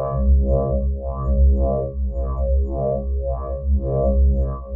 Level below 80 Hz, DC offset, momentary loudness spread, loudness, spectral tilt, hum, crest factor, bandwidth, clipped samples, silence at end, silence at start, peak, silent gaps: -20 dBFS; under 0.1%; 8 LU; -21 LUFS; -14.5 dB/octave; none; 12 dB; 1.6 kHz; under 0.1%; 0 s; 0 s; -8 dBFS; none